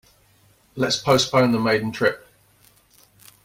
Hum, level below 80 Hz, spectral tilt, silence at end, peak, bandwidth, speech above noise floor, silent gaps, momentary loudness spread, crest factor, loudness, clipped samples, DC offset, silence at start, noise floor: none; -56 dBFS; -4.5 dB/octave; 1.25 s; -6 dBFS; 16.5 kHz; 38 dB; none; 13 LU; 18 dB; -20 LUFS; under 0.1%; under 0.1%; 0.75 s; -58 dBFS